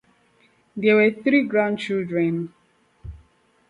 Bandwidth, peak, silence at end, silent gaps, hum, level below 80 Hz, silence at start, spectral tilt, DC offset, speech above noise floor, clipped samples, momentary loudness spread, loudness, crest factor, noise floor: 10 kHz; -6 dBFS; 0.55 s; none; none; -52 dBFS; 0.75 s; -7.5 dB/octave; under 0.1%; 40 dB; under 0.1%; 24 LU; -21 LUFS; 18 dB; -60 dBFS